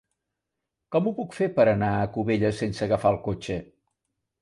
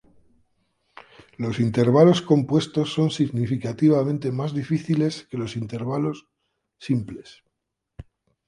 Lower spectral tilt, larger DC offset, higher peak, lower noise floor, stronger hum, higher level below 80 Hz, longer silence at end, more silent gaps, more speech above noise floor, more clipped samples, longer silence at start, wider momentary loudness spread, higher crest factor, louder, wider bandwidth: about the same, -7.5 dB/octave vs -7.5 dB/octave; neither; second, -8 dBFS vs -2 dBFS; first, -84 dBFS vs -80 dBFS; neither; about the same, -52 dBFS vs -56 dBFS; first, 0.75 s vs 0.45 s; neither; about the same, 59 dB vs 58 dB; neither; second, 0.9 s vs 1.4 s; second, 9 LU vs 14 LU; about the same, 18 dB vs 22 dB; second, -25 LUFS vs -22 LUFS; about the same, 11.5 kHz vs 11 kHz